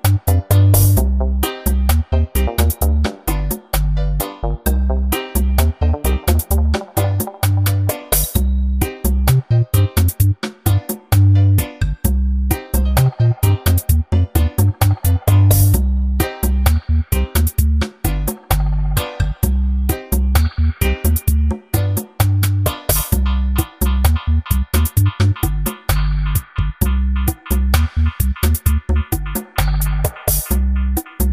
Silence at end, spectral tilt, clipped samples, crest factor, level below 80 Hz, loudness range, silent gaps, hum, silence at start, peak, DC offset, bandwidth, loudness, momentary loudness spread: 0 s; -5.5 dB/octave; under 0.1%; 16 dB; -18 dBFS; 3 LU; none; none; 0.05 s; 0 dBFS; under 0.1%; 16.5 kHz; -17 LUFS; 6 LU